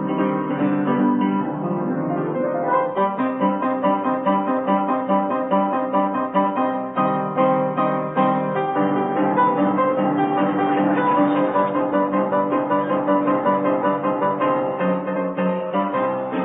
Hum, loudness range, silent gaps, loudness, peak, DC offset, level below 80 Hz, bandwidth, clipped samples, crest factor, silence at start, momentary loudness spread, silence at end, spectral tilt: none; 2 LU; none; -20 LUFS; -6 dBFS; under 0.1%; -66 dBFS; 4 kHz; under 0.1%; 14 dB; 0 s; 4 LU; 0 s; -12 dB/octave